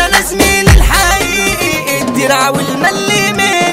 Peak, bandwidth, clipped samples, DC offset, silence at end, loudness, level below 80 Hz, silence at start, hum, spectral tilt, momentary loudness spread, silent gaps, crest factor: 0 dBFS; 16.5 kHz; 0.6%; under 0.1%; 0 s; -10 LUFS; -18 dBFS; 0 s; none; -3.5 dB/octave; 5 LU; none; 10 dB